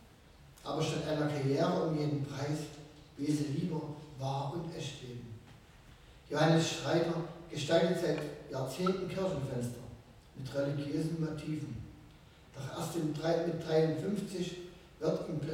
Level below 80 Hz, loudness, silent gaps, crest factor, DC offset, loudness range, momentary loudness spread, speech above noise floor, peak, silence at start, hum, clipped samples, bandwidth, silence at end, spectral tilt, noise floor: -62 dBFS; -35 LUFS; none; 20 dB; under 0.1%; 6 LU; 17 LU; 24 dB; -16 dBFS; 0 s; none; under 0.1%; 16 kHz; 0 s; -6 dB/octave; -58 dBFS